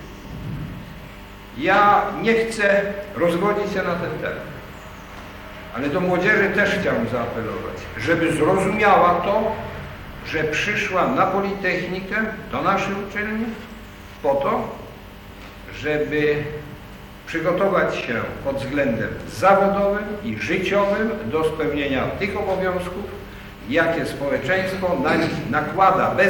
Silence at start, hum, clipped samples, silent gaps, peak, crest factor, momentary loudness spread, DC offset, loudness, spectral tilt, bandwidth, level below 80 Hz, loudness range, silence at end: 0 s; 50 Hz at -45 dBFS; under 0.1%; none; -4 dBFS; 18 dB; 20 LU; under 0.1%; -21 LUFS; -6 dB/octave; 19 kHz; -44 dBFS; 5 LU; 0 s